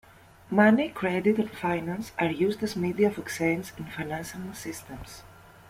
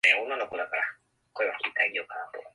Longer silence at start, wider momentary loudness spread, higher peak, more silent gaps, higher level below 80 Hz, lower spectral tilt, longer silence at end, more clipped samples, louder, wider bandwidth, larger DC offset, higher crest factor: first, 0.5 s vs 0.05 s; first, 17 LU vs 12 LU; about the same, -8 dBFS vs -8 dBFS; neither; first, -58 dBFS vs -76 dBFS; first, -6 dB/octave vs -1 dB/octave; first, 0.35 s vs 0.05 s; neither; about the same, -27 LUFS vs -29 LUFS; first, 16 kHz vs 11.5 kHz; neither; about the same, 20 dB vs 22 dB